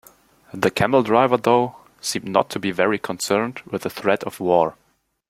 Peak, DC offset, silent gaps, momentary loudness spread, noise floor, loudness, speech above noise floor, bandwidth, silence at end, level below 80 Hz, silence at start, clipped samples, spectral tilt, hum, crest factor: -2 dBFS; under 0.1%; none; 11 LU; -52 dBFS; -21 LUFS; 32 dB; 16.5 kHz; 0.6 s; -58 dBFS; 0.55 s; under 0.1%; -4.5 dB/octave; none; 20 dB